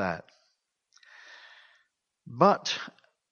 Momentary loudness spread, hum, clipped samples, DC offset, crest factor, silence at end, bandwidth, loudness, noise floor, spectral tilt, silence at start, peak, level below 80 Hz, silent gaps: 26 LU; none; under 0.1%; under 0.1%; 24 dB; 0.4 s; 7.2 kHz; -27 LUFS; -75 dBFS; -4.5 dB/octave; 0 s; -8 dBFS; -72 dBFS; none